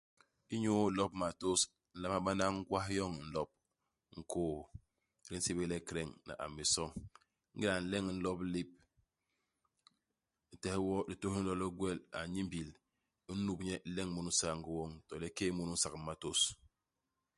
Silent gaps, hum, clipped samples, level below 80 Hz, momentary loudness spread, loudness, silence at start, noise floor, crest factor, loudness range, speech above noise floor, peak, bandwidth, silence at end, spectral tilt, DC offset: none; none; under 0.1%; -60 dBFS; 12 LU; -38 LUFS; 0.5 s; -89 dBFS; 22 dB; 6 LU; 51 dB; -18 dBFS; 11.5 kHz; 0.8 s; -3.5 dB/octave; under 0.1%